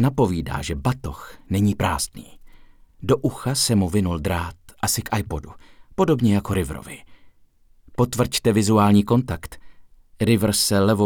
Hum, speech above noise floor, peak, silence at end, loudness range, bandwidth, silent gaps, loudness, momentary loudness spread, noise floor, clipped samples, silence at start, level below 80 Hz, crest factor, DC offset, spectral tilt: none; 33 dB; -6 dBFS; 0 s; 4 LU; 19.5 kHz; none; -21 LUFS; 15 LU; -54 dBFS; under 0.1%; 0 s; -40 dBFS; 16 dB; under 0.1%; -5 dB/octave